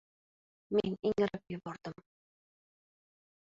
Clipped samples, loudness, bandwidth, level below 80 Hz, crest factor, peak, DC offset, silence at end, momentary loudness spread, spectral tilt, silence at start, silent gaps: under 0.1%; -35 LUFS; 7.6 kHz; -68 dBFS; 22 dB; -18 dBFS; under 0.1%; 1.6 s; 13 LU; -7.5 dB/octave; 0.7 s; none